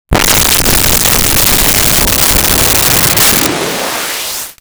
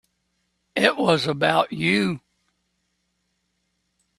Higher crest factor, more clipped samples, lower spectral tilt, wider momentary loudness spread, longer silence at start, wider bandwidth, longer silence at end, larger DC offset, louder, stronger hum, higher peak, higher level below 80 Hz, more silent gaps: second, 10 dB vs 26 dB; neither; second, -2 dB/octave vs -5 dB/octave; about the same, 8 LU vs 9 LU; second, 0.1 s vs 0.75 s; first, over 20 kHz vs 13 kHz; second, 0.1 s vs 2 s; neither; first, -7 LUFS vs -21 LUFS; neither; about the same, 0 dBFS vs 0 dBFS; first, -22 dBFS vs -64 dBFS; neither